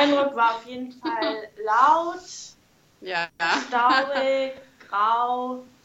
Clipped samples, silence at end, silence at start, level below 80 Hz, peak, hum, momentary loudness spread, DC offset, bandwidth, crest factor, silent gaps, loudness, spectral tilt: under 0.1%; 0.2 s; 0 s; -72 dBFS; -4 dBFS; none; 17 LU; under 0.1%; 8.2 kHz; 20 dB; none; -23 LUFS; -2.5 dB/octave